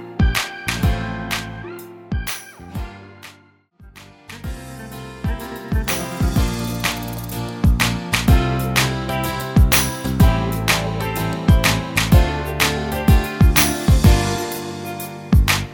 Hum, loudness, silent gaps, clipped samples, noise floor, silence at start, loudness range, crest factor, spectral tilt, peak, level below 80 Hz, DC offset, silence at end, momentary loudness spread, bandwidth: none; -19 LUFS; none; under 0.1%; -51 dBFS; 0 s; 15 LU; 18 dB; -4.5 dB/octave; 0 dBFS; -24 dBFS; under 0.1%; 0 s; 17 LU; 19 kHz